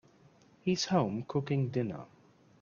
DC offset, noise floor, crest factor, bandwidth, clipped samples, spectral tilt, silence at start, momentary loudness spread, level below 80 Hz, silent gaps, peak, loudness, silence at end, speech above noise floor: under 0.1%; -62 dBFS; 20 dB; 7.4 kHz; under 0.1%; -6 dB/octave; 0.65 s; 9 LU; -68 dBFS; none; -14 dBFS; -33 LUFS; 0.55 s; 31 dB